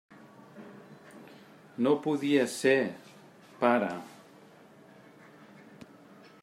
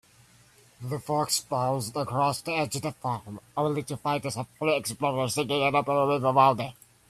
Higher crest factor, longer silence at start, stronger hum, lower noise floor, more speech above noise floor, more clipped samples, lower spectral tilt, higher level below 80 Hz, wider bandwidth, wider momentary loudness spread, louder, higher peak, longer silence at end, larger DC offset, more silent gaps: about the same, 24 dB vs 20 dB; second, 0.55 s vs 0.8 s; neither; about the same, -55 dBFS vs -58 dBFS; about the same, 28 dB vs 31 dB; neither; about the same, -5 dB/octave vs -4.5 dB/octave; second, -82 dBFS vs -64 dBFS; about the same, 16 kHz vs 15 kHz; first, 26 LU vs 11 LU; about the same, -28 LUFS vs -27 LUFS; about the same, -10 dBFS vs -8 dBFS; first, 2.3 s vs 0.35 s; neither; neither